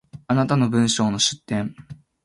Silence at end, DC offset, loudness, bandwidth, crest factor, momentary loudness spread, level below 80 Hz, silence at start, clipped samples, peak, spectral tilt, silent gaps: 0.3 s; under 0.1%; -21 LUFS; 11.5 kHz; 16 dB; 8 LU; -56 dBFS; 0.15 s; under 0.1%; -6 dBFS; -4.5 dB/octave; none